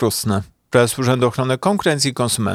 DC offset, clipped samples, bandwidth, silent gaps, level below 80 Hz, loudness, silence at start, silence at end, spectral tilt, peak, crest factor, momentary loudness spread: under 0.1%; under 0.1%; 16.5 kHz; none; -52 dBFS; -18 LUFS; 0 s; 0 s; -4.5 dB/octave; -2 dBFS; 16 dB; 4 LU